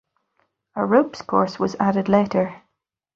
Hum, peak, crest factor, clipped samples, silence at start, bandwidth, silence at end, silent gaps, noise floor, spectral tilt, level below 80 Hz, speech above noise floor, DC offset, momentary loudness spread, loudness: none; -2 dBFS; 20 dB; under 0.1%; 0.75 s; 7.2 kHz; 0.6 s; none; -77 dBFS; -7.5 dB/octave; -60 dBFS; 57 dB; under 0.1%; 8 LU; -21 LUFS